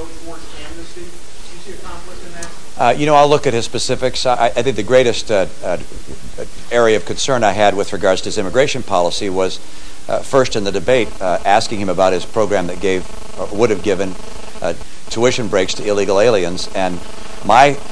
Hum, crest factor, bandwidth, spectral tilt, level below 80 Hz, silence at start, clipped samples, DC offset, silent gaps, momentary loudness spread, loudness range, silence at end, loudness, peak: none; 18 dB; 11 kHz; -4 dB/octave; -40 dBFS; 0 s; under 0.1%; 10%; none; 20 LU; 4 LU; 0 s; -16 LUFS; 0 dBFS